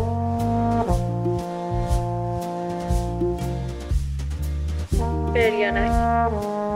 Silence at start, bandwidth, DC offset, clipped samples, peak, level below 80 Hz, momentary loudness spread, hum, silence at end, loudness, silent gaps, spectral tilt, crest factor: 0 s; 16 kHz; under 0.1%; under 0.1%; -8 dBFS; -30 dBFS; 8 LU; none; 0 s; -24 LUFS; none; -7 dB/octave; 16 dB